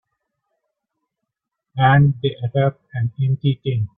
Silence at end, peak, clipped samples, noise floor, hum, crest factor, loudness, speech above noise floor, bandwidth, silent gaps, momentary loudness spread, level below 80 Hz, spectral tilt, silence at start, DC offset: 0.1 s; -4 dBFS; under 0.1%; -81 dBFS; none; 18 dB; -19 LUFS; 63 dB; 3.8 kHz; none; 11 LU; -52 dBFS; -11.5 dB/octave; 1.75 s; under 0.1%